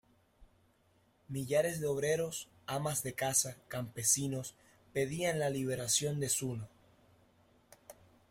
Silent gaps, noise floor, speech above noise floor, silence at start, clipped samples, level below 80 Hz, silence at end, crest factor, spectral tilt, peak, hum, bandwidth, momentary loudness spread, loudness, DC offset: none; -71 dBFS; 36 dB; 0.4 s; under 0.1%; -68 dBFS; 0.4 s; 22 dB; -3.5 dB/octave; -16 dBFS; none; 16.5 kHz; 12 LU; -34 LUFS; under 0.1%